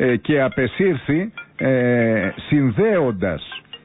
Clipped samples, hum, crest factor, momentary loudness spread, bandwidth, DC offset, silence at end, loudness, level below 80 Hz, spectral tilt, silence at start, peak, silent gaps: under 0.1%; none; 12 dB; 7 LU; 4 kHz; under 0.1%; 0.1 s; -19 LUFS; -46 dBFS; -12 dB/octave; 0 s; -8 dBFS; none